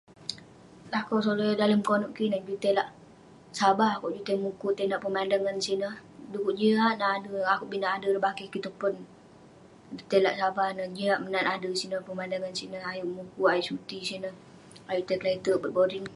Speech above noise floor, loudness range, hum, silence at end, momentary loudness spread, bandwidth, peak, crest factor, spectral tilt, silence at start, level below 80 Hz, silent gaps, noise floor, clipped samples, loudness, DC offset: 25 dB; 3 LU; none; 0 s; 12 LU; 11.5 kHz; -10 dBFS; 20 dB; -5 dB/octave; 0.2 s; -70 dBFS; none; -53 dBFS; under 0.1%; -29 LUFS; under 0.1%